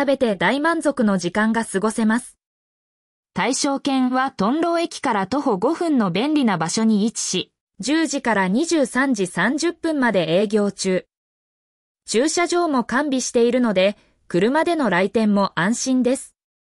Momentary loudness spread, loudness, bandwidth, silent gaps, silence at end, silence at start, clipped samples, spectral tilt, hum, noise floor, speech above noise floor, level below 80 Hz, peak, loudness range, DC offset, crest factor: 4 LU; -20 LUFS; 12 kHz; 2.46-3.23 s, 7.60-7.67 s, 11.17-11.95 s; 0.5 s; 0 s; under 0.1%; -4.5 dB/octave; none; under -90 dBFS; over 71 dB; -60 dBFS; -6 dBFS; 3 LU; under 0.1%; 14 dB